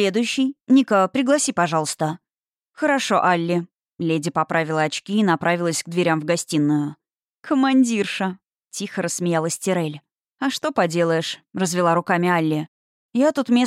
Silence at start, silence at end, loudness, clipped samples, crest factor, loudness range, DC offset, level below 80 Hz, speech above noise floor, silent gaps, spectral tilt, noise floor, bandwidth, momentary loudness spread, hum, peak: 0 s; 0 s; -21 LUFS; under 0.1%; 16 dB; 3 LU; under 0.1%; -72 dBFS; over 70 dB; 2.58-2.62 s, 7.37-7.42 s, 10.31-10.37 s, 12.68-13.09 s; -4.5 dB/octave; under -90 dBFS; 15 kHz; 10 LU; none; -6 dBFS